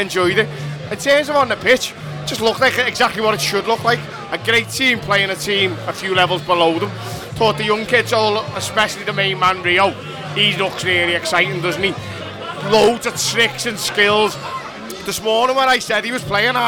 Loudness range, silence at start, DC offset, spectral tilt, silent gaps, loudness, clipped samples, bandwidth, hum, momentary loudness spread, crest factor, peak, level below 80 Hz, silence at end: 1 LU; 0 s; under 0.1%; -3.5 dB/octave; none; -16 LUFS; under 0.1%; 20 kHz; none; 11 LU; 16 dB; -2 dBFS; -50 dBFS; 0 s